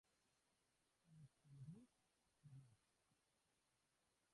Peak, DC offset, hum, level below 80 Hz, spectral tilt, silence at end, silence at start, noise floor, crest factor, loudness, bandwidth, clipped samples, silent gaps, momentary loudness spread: -50 dBFS; under 0.1%; none; under -90 dBFS; -6.5 dB/octave; 0 s; 0.05 s; -87 dBFS; 20 dB; -65 LUFS; 11 kHz; under 0.1%; none; 6 LU